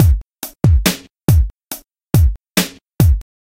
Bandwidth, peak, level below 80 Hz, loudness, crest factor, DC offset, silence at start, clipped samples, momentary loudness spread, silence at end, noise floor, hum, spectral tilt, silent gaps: 17 kHz; 0 dBFS; -20 dBFS; -16 LUFS; 14 dB; under 0.1%; 0 s; under 0.1%; 16 LU; 0.2 s; -34 dBFS; none; -5.5 dB/octave; none